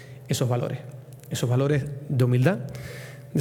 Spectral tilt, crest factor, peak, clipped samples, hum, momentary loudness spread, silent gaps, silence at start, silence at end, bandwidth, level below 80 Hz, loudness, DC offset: -6.5 dB/octave; 18 dB; -6 dBFS; under 0.1%; none; 17 LU; none; 0 s; 0 s; 16.5 kHz; -58 dBFS; -25 LUFS; under 0.1%